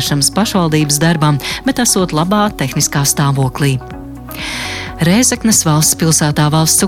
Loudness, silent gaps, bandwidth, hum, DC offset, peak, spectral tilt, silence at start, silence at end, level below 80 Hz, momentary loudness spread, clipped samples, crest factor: -12 LUFS; none; 17 kHz; none; under 0.1%; 0 dBFS; -4 dB/octave; 0 s; 0 s; -36 dBFS; 11 LU; under 0.1%; 12 dB